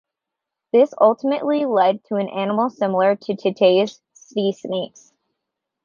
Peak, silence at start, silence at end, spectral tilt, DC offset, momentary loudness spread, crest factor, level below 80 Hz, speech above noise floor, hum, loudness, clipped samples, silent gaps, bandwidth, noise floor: -2 dBFS; 0.75 s; 0.95 s; -6.5 dB/octave; under 0.1%; 10 LU; 18 dB; -72 dBFS; 65 dB; none; -19 LUFS; under 0.1%; none; 7.2 kHz; -84 dBFS